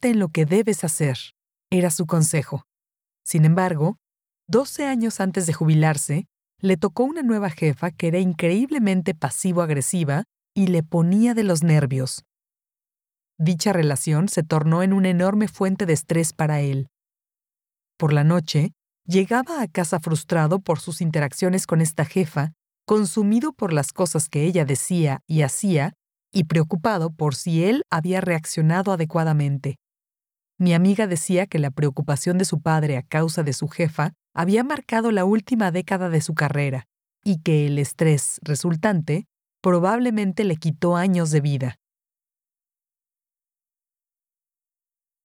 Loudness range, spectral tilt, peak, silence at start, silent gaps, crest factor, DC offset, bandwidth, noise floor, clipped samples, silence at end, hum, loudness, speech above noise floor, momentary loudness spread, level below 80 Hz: 2 LU; -6 dB/octave; -6 dBFS; 0.05 s; none; 16 dB; under 0.1%; 17 kHz; under -90 dBFS; under 0.1%; 3.5 s; none; -21 LUFS; over 70 dB; 7 LU; -64 dBFS